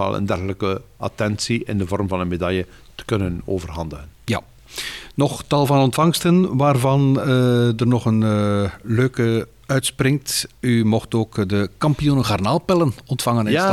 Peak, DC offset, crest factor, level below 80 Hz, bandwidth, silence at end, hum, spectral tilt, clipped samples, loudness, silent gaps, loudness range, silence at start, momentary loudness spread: -6 dBFS; 0.2%; 14 dB; -44 dBFS; 15 kHz; 0 s; none; -6 dB/octave; under 0.1%; -20 LUFS; none; 7 LU; 0 s; 10 LU